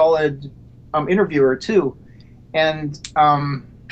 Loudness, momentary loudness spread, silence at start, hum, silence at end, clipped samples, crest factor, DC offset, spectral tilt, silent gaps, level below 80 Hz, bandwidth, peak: -19 LUFS; 12 LU; 0 s; none; 0.3 s; under 0.1%; 14 dB; under 0.1%; -6.5 dB/octave; none; -48 dBFS; 8.8 kHz; -4 dBFS